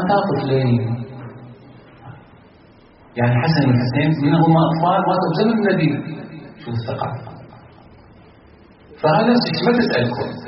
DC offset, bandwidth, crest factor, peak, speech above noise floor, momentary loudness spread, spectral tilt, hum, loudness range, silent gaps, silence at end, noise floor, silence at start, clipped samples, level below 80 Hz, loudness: under 0.1%; 5.8 kHz; 16 dB; -4 dBFS; 31 dB; 18 LU; -6 dB/octave; none; 8 LU; none; 0 s; -48 dBFS; 0 s; under 0.1%; -52 dBFS; -18 LUFS